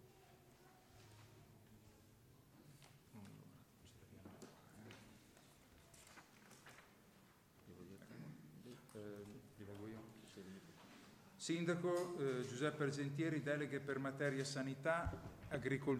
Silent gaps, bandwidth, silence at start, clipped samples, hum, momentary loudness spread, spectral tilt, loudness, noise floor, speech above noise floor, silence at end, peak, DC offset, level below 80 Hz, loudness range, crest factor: none; 16 kHz; 0 s; under 0.1%; none; 25 LU; -5.5 dB/octave; -45 LUFS; -69 dBFS; 26 dB; 0 s; -26 dBFS; under 0.1%; -68 dBFS; 21 LU; 22 dB